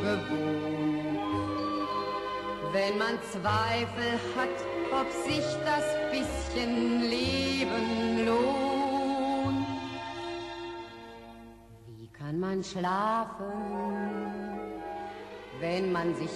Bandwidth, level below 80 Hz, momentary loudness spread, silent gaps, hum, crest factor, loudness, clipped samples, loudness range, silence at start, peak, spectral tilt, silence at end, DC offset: 13 kHz; -54 dBFS; 12 LU; none; none; 16 dB; -31 LUFS; under 0.1%; 6 LU; 0 s; -16 dBFS; -5 dB/octave; 0 s; under 0.1%